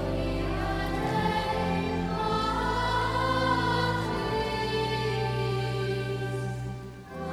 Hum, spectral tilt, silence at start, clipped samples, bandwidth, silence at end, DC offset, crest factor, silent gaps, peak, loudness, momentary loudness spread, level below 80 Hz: none; -6 dB/octave; 0 s; under 0.1%; 15.5 kHz; 0 s; under 0.1%; 14 dB; none; -14 dBFS; -29 LUFS; 7 LU; -40 dBFS